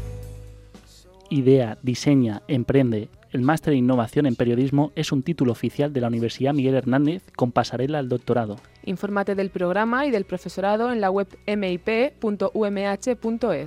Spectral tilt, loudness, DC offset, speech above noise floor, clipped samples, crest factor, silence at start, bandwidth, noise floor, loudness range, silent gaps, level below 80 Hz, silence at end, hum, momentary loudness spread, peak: -7 dB/octave; -23 LUFS; under 0.1%; 27 dB; under 0.1%; 18 dB; 0 s; 14 kHz; -49 dBFS; 3 LU; none; -50 dBFS; 0 s; none; 6 LU; -4 dBFS